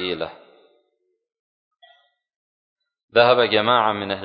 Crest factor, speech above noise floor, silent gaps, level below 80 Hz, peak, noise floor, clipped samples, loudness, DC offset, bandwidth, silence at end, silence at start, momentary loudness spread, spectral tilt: 20 dB; 53 dB; 1.39-1.71 s, 2.36-2.76 s, 3.04-3.08 s; -62 dBFS; -2 dBFS; -72 dBFS; under 0.1%; -18 LUFS; under 0.1%; 5.2 kHz; 0 s; 0 s; 13 LU; -9 dB/octave